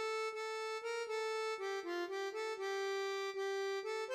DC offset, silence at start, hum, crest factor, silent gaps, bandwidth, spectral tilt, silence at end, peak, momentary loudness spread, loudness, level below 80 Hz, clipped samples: under 0.1%; 0 s; none; 12 dB; none; 15.5 kHz; 0 dB/octave; 0 s; -28 dBFS; 2 LU; -40 LUFS; under -90 dBFS; under 0.1%